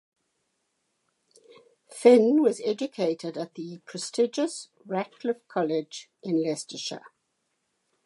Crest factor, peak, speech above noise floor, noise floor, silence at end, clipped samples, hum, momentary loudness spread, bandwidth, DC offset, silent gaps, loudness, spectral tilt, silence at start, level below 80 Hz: 22 dB; -6 dBFS; 51 dB; -77 dBFS; 1.05 s; under 0.1%; none; 20 LU; 11.5 kHz; under 0.1%; none; -26 LUFS; -5 dB/octave; 1.9 s; -86 dBFS